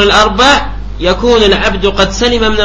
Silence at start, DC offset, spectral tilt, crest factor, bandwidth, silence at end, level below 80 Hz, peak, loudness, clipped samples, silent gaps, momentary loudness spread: 0 s; under 0.1%; -3.5 dB/octave; 10 dB; 11 kHz; 0 s; -22 dBFS; 0 dBFS; -9 LUFS; 0.6%; none; 7 LU